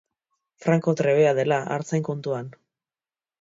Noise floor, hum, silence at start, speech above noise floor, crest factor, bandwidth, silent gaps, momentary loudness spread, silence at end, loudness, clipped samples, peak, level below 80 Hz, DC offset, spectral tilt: under -90 dBFS; none; 0.6 s; over 68 dB; 18 dB; 7.8 kHz; none; 11 LU; 0.9 s; -23 LUFS; under 0.1%; -8 dBFS; -70 dBFS; under 0.1%; -7 dB/octave